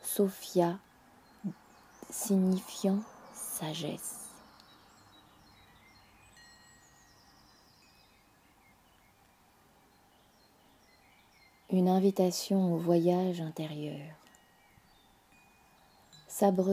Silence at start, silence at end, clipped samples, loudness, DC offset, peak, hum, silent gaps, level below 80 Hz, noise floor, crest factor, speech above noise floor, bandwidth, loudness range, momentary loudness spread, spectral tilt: 0.05 s; 0 s; under 0.1%; -32 LUFS; under 0.1%; -14 dBFS; none; none; -74 dBFS; -64 dBFS; 22 dB; 35 dB; 16 kHz; 12 LU; 18 LU; -6 dB/octave